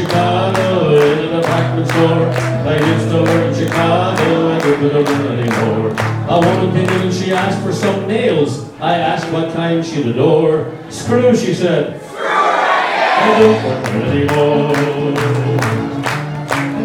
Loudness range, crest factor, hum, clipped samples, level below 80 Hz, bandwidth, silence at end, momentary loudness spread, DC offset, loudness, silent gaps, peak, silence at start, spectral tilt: 2 LU; 14 dB; none; under 0.1%; -48 dBFS; 18 kHz; 0 s; 6 LU; under 0.1%; -14 LUFS; none; 0 dBFS; 0 s; -6.5 dB/octave